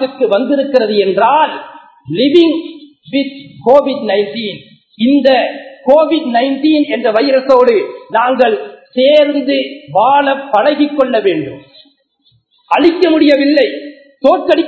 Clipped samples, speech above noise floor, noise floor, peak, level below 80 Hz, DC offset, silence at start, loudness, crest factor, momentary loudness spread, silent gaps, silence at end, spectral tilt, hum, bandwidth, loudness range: 0.3%; 45 dB; -56 dBFS; 0 dBFS; -58 dBFS; under 0.1%; 0 s; -12 LUFS; 12 dB; 11 LU; none; 0 s; -6.5 dB/octave; none; 8 kHz; 3 LU